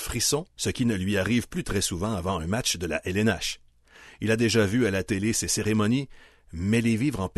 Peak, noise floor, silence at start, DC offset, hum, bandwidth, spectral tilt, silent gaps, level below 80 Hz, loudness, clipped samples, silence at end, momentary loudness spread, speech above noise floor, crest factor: -10 dBFS; -52 dBFS; 0 s; under 0.1%; none; 12.5 kHz; -4.5 dB/octave; none; -48 dBFS; -26 LUFS; under 0.1%; 0.1 s; 7 LU; 27 dB; 16 dB